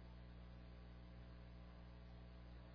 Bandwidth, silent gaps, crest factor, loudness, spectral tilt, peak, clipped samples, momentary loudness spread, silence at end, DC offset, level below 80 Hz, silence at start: 5.4 kHz; none; 8 dB; -60 LUFS; -6 dB/octave; -50 dBFS; under 0.1%; 0 LU; 0 s; under 0.1%; -60 dBFS; 0 s